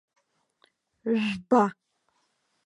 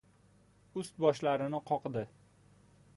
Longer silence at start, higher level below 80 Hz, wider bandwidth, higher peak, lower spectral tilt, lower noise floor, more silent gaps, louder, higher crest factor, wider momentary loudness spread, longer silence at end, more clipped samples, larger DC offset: first, 1.05 s vs 0.75 s; about the same, -72 dBFS vs -72 dBFS; about the same, 11 kHz vs 11.5 kHz; first, -10 dBFS vs -14 dBFS; about the same, -6.5 dB/octave vs -6.5 dB/octave; first, -73 dBFS vs -65 dBFS; neither; first, -26 LUFS vs -34 LUFS; about the same, 20 dB vs 22 dB; second, 7 LU vs 13 LU; about the same, 0.95 s vs 0.9 s; neither; neither